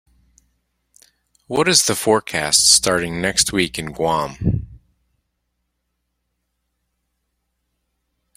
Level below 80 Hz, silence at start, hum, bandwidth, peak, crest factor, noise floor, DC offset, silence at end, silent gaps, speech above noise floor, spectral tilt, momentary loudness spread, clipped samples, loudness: -44 dBFS; 1.5 s; 60 Hz at -50 dBFS; 16.5 kHz; 0 dBFS; 22 dB; -74 dBFS; under 0.1%; 3.6 s; none; 56 dB; -2.5 dB/octave; 11 LU; under 0.1%; -16 LUFS